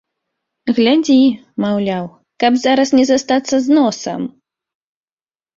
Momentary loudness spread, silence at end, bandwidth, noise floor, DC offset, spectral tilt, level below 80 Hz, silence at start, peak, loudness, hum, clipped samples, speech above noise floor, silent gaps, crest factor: 12 LU; 1.3 s; 7.8 kHz; under -90 dBFS; under 0.1%; -4.5 dB/octave; -58 dBFS; 0.65 s; -2 dBFS; -14 LUFS; none; under 0.1%; over 76 dB; none; 14 dB